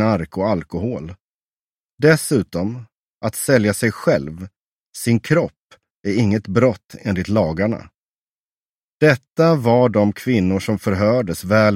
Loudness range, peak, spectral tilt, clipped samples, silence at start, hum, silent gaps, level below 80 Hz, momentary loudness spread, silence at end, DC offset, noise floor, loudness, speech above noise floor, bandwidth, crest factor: 4 LU; 0 dBFS; -6.5 dB/octave; under 0.1%; 0 s; none; 1.21-1.98 s, 2.95-3.21 s, 4.61-4.93 s, 5.57-5.69 s, 5.90-6.04 s, 6.85-6.89 s, 7.98-9.00 s, 9.32-9.36 s; -48 dBFS; 12 LU; 0 s; under 0.1%; under -90 dBFS; -18 LUFS; over 73 dB; 16.5 kHz; 18 dB